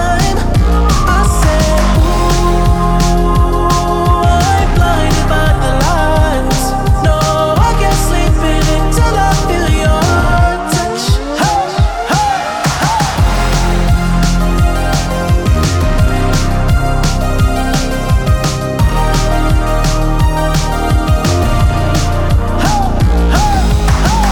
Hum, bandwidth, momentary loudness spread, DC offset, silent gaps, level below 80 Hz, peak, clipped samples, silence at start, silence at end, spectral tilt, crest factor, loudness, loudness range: none; 19 kHz; 3 LU; under 0.1%; none; -14 dBFS; 0 dBFS; under 0.1%; 0 s; 0 s; -5.5 dB/octave; 10 dB; -12 LUFS; 2 LU